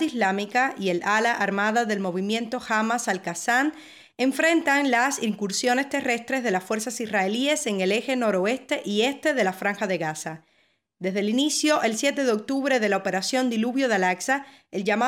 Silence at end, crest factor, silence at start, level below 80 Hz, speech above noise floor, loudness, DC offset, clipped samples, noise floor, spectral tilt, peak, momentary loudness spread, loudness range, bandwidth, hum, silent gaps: 0 s; 16 dB; 0 s; -74 dBFS; 42 dB; -24 LUFS; under 0.1%; under 0.1%; -67 dBFS; -3.5 dB/octave; -10 dBFS; 6 LU; 2 LU; 17 kHz; none; none